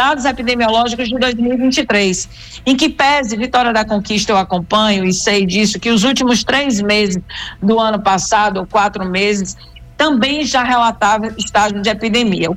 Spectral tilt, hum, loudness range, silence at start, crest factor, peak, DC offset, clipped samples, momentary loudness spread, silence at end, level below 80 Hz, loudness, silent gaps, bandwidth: -3.5 dB/octave; none; 1 LU; 0 s; 12 dB; -4 dBFS; under 0.1%; under 0.1%; 4 LU; 0 s; -40 dBFS; -14 LUFS; none; 14.5 kHz